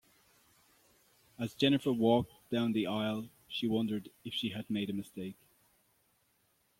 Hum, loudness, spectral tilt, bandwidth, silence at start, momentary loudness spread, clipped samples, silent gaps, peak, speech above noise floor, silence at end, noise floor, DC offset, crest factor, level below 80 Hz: none; -34 LUFS; -6.5 dB/octave; 16.5 kHz; 1.4 s; 13 LU; under 0.1%; none; -14 dBFS; 41 dB; 1.45 s; -74 dBFS; under 0.1%; 22 dB; -70 dBFS